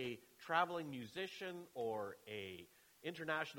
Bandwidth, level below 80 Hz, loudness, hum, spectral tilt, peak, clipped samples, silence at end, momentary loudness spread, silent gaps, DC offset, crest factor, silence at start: 19 kHz; -84 dBFS; -44 LUFS; none; -4.5 dB/octave; -22 dBFS; under 0.1%; 0 s; 14 LU; none; under 0.1%; 24 dB; 0 s